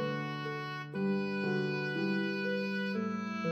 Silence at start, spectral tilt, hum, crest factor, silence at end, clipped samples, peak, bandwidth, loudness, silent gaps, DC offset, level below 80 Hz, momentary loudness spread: 0 s; -7 dB/octave; none; 12 dB; 0 s; under 0.1%; -22 dBFS; 7.8 kHz; -34 LUFS; none; under 0.1%; -86 dBFS; 5 LU